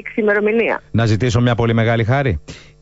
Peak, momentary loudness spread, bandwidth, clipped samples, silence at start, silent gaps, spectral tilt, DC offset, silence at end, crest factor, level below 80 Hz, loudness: -6 dBFS; 3 LU; 8 kHz; under 0.1%; 0.05 s; none; -7 dB/octave; under 0.1%; 0.25 s; 10 dB; -38 dBFS; -16 LUFS